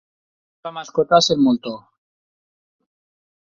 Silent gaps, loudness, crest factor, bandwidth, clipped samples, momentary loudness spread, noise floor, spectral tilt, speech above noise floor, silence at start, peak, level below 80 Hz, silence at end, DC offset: none; -17 LUFS; 20 dB; 7.4 kHz; under 0.1%; 20 LU; under -90 dBFS; -4.5 dB/octave; over 72 dB; 0.65 s; -2 dBFS; -60 dBFS; 1.75 s; under 0.1%